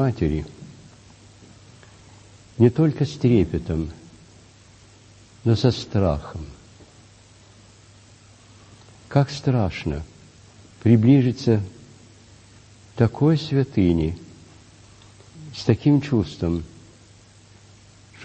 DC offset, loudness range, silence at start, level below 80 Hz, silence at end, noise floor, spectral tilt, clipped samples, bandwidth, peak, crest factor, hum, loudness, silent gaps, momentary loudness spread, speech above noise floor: under 0.1%; 6 LU; 0 s; -44 dBFS; 0 s; -50 dBFS; -8 dB/octave; under 0.1%; 8.6 kHz; -2 dBFS; 22 dB; none; -21 LUFS; none; 20 LU; 30 dB